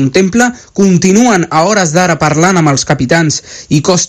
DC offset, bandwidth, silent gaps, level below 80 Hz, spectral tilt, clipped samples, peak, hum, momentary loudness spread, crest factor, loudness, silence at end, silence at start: under 0.1%; 14 kHz; none; -42 dBFS; -4.5 dB/octave; 0.9%; 0 dBFS; none; 5 LU; 10 dB; -9 LUFS; 0 s; 0 s